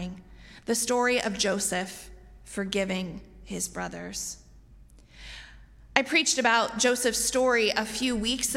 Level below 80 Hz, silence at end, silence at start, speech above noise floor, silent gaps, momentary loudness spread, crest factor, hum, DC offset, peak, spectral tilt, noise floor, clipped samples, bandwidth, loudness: -52 dBFS; 0 s; 0 s; 25 dB; none; 21 LU; 28 dB; none; under 0.1%; -2 dBFS; -2 dB/octave; -52 dBFS; under 0.1%; 16 kHz; -26 LUFS